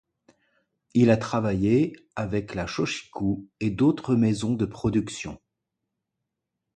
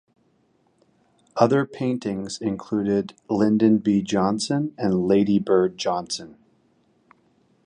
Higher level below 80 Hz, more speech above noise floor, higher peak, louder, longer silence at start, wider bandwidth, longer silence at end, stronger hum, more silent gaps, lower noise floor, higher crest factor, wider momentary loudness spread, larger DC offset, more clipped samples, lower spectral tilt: first, -50 dBFS vs -58 dBFS; first, 59 dB vs 43 dB; second, -8 dBFS vs -4 dBFS; second, -25 LUFS vs -22 LUFS; second, 0.95 s vs 1.35 s; second, 9.2 kHz vs 10.5 kHz; about the same, 1.4 s vs 1.35 s; neither; neither; first, -83 dBFS vs -64 dBFS; about the same, 18 dB vs 20 dB; about the same, 9 LU vs 9 LU; neither; neither; about the same, -7 dB/octave vs -6 dB/octave